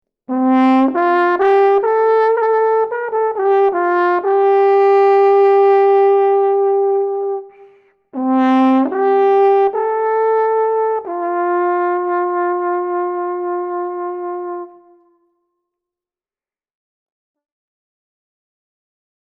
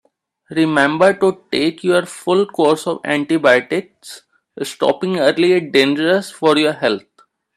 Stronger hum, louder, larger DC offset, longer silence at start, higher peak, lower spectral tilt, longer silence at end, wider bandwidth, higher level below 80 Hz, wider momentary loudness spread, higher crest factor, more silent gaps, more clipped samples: neither; about the same, -15 LUFS vs -16 LUFS; neither; second, 0.3 s vs 0.5 s; second, -4 dBFS vs 0 dBFS; about the same, -6 dB/octave vs -5 dB/octave; first, 4.7 s vs 0.55 s; second, 5.4 kHz vs 13.5 kHz; about the same, -68 dBFS vs -64 dBFS; about the same, 11 LU vs 11 LU; about the same, 12 dB vs 16 dB; neither; neither